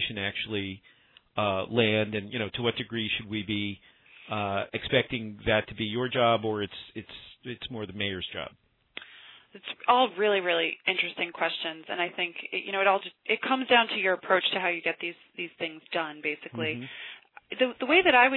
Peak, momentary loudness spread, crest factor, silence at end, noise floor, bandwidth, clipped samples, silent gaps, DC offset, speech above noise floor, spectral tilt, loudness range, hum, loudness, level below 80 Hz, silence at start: -8 dBFS; 18 LU; 22 dB; 0 s; -52 dBFS; 4.3 kHz; under 0.1%; none; under 0.1%; 24 dB; -8 dB/octave; 5 LU; none; -28 LUFS; -60 dBFS; 0 s